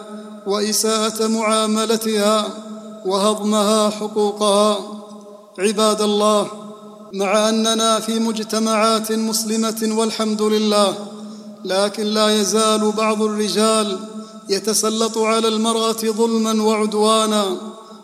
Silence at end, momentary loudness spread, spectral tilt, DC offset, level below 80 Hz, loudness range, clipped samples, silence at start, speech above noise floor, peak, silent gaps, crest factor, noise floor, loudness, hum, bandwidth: 0 s; 16 LU; -3.5 dB/octave; under 0.1%; -68 dBFS; 1 LU; under 0.1%; 0 s; 21 dB; -2 dBFS; none; 16 dB; -39 dBFS; -18 LUFS; none; 15.5 kHz